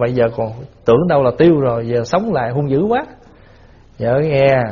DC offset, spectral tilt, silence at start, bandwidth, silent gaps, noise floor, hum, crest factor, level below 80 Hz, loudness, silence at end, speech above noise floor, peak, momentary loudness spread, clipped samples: under 0.1%; -6.5 dB/octave; 0 s; 7.2 kHz; none; -44 dBFS; none; 16 dB; -44 dBFS; -15 LUFS; 0 s; 29 dB; 0 dBFS; 10 LU; under 0.1%